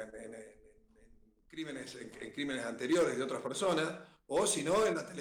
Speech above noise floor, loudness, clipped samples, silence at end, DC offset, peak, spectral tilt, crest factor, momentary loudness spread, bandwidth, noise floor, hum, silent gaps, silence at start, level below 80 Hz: 29 dB; -34 LUFS; under 0.1%; 0 s; under 0.1%; -22 dBFS; -3.5 dB/octave; 14 dB; 18 LU; over 20 kHz; -63 dBFS; none; none; 0 s; -68 dBFS